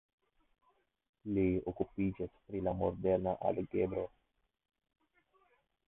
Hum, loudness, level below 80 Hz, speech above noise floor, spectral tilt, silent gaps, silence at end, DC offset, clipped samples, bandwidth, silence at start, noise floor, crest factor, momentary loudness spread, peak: none; -36 LUFS; -58 dBFS; 38 dB; -6.5 dB/octave; none; 1.8 s; under 0.1%; under 0.1%; 3.9 kHz; 1.25 s; -74 dBFS; 20 dB; 9 LU; -18 dBFS